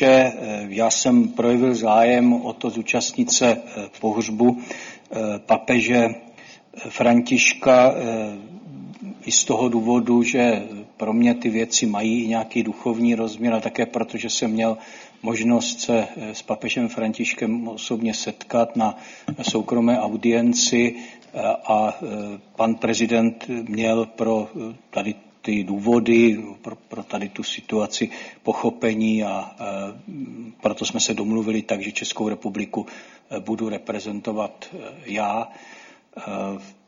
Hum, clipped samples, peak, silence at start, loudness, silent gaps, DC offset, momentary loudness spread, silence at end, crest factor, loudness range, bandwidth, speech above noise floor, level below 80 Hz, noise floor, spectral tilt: none; under 0.1%; -2 dBFS; 0 s; -21 LUFS; none; under 0.1%; 17 LU; 0.15 s; 20 dB; 6 LU; 7.6 kHz; 24 dB; -62 dBFS; -46 dBFS; -3.5 dB/octave